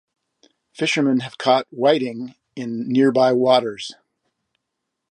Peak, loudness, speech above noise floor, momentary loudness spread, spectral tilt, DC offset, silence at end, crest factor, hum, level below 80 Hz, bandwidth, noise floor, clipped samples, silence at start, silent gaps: -2 dBFS; -19 LUFS; 60 dB; 17 LU; -5 dB/octave; under 0.1%; 1.2 s; 18 dB; none; -72 dBFS; 10.5 kHz; -79 dBFS; under 0.1%; 0.8 s; none